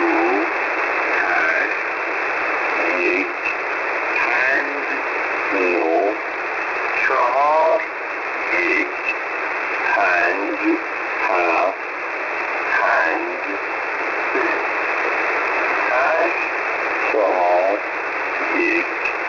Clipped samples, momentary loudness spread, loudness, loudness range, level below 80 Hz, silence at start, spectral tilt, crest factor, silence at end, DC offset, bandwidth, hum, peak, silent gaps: under 0.1%; 6 LU; -19 LUFS; 1 LU; -62 dBFS; 0 s; -3.5 dB/octave; 12 dB; 0 s; under 0.1%; 6 kHz; none; -6 dBFS; none